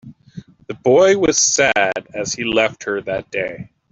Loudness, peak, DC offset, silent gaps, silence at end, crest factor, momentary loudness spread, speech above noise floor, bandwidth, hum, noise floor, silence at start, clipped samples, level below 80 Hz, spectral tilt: -16 LUFS; -2 dBFS; under 0.1%; none; 0.3 s; 16 dB; 11 LU; 22 dB; 8.2 kHz; none; -39 dBFS; 0.05 s; under 0.1%; -52 dBFS; -2.5 dB/octave